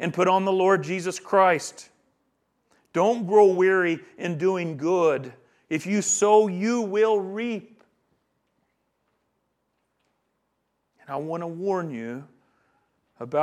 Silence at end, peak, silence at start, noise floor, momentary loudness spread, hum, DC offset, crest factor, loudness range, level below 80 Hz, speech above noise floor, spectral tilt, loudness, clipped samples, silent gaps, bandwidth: 0 s; -6 dBFS; 0 s; -75 dBFS; 15 LU; none; under 0.1%; 20 dB; 12 LU; -80 dBFS; 53 dB; -4.5 dB/octave; -23 LUFS; under 0.1%; none; 12.5 kHz